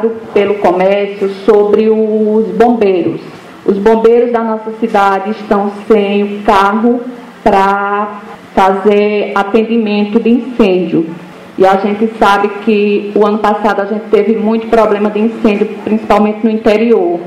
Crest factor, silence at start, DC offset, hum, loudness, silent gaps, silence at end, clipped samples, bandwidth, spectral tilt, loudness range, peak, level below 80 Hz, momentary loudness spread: 10 dB; 0 s; under 0.1%; none; -11 LUFS; none; 0 s; 0.6%; 11.5 kHz; -7 dB/octave; 1 LU; 0 dBFS; -42 dBFS; 7 LU